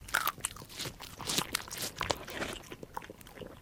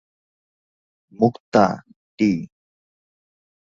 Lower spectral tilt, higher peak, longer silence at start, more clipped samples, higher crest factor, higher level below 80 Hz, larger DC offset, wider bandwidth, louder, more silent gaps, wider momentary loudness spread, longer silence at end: second, -1.5 dB/octave vs -7.5 dB/octave; second, -6 dBFS vs -2 dBFS; second, 0 s vs 1.2 s; neither; first, 34 dB vs 22 dB; about the same, -56 dBFS vs -60 dBFS; neither; first, 17 kHz vs 7.4 kHz; second, -36 LUFS vs -20 LUFS; second, none vs 1.40-1.52 s, 1.96-2.18 s; about the same, 13 LU vs 13 LU; second, 0 s vs 1.2 s